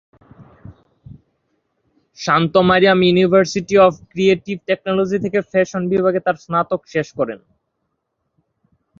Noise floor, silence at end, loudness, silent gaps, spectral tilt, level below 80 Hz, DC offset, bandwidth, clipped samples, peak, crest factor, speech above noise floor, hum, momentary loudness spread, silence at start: -73 dBFS; 1.65 s; -16 LUFS; none; -6 dB/octave; -54 dBFS; under 0.1%; 7.6 kHz; under 0.1%; -2 dBFS; 16 dB; 57 dB; none; 10 LU; 0.65 s